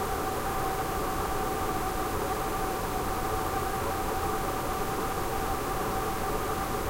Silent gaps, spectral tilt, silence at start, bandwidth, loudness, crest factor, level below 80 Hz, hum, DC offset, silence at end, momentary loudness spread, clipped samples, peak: none; -4.5 dB/octave; 0 s; 16 kHz; -31 LUFS; 14 dB; -40 dBFS; none; 0.1%; 0 s; 1 LU; under 0.1%; -16 dBFS